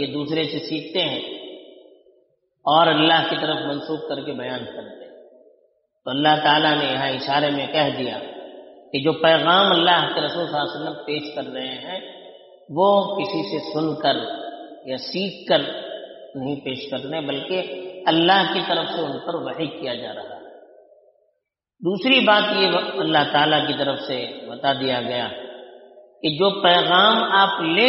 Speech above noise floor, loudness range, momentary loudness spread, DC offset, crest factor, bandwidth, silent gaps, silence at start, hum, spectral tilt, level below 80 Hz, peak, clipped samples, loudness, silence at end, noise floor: 55 dB; 6 LU; 18 LU; under 0.1%; 20 dB; 6 kHz; none; 0 s; none; -1.5 dB/octave; -68 dBFS; -2 dBFS; under 0.1%; -20 LUFS; 0 s; -75 dBFS